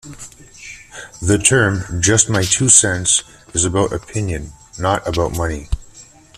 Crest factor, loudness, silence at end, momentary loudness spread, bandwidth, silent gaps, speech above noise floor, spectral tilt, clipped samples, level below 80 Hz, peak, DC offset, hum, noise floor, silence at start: 18 dB; -15 LUFS; 0.35 s; 25 LU; 15.5 kHz; none; 27 dB; -3 dB/octave; under 0.1%; -36 dBFS; 0 dBFS; under 0.1%; none; -43 dBFS; 0.05 s